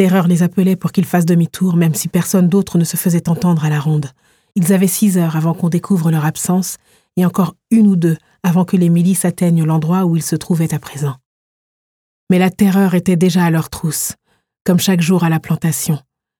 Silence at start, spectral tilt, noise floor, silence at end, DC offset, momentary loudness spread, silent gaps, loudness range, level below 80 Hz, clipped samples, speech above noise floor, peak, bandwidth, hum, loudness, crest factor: 0 s; -6 dB/octave; under -90 dBFS; 0.4 s; under 0.1%; 7 LU; 11.26-12.27 s; 2 LU; -52 dBFS; under 0.1%; over 76 dB; 0 dBFS; 18 kHz; none; -15 LUFS; 14 dB